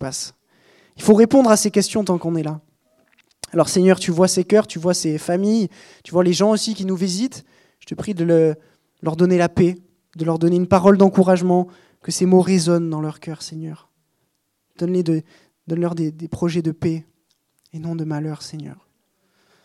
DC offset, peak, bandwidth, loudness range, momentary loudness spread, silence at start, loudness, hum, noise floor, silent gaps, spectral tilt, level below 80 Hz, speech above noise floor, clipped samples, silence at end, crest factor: under 0.1%; 0 dBFS; 13.5 kHz; 8 LU; 17 LU; 0 s; -18 LUFS; none; -71 dBFS; none; -6 dB/octave; -58 dBFS; 53 dB; under 0.1%; 0.9 s; 20 dB